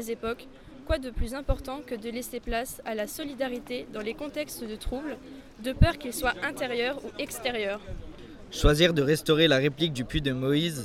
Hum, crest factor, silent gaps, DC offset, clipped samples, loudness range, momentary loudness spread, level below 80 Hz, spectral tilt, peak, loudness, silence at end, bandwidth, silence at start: none; 24 dB; none; under 0.1%; under 0.1%; 8 LU; 16 LU; -38 dBFS; -5 dB/octave; -6 dBFS; -29 LUFS; 0 s; 16.5 kHz; 0 s